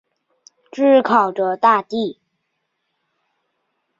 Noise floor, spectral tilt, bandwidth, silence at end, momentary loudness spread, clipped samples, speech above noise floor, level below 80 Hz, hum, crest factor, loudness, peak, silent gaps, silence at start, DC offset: -73 dBFS; -6 dB/octave; 7.6 kHz; 1.85 s; 12 LU; under 0.1%; 58 dB; -70 dBFS; none; 18 dB; -16 LUFS; -2 dBFS; none; 0.75 s; under 0.1%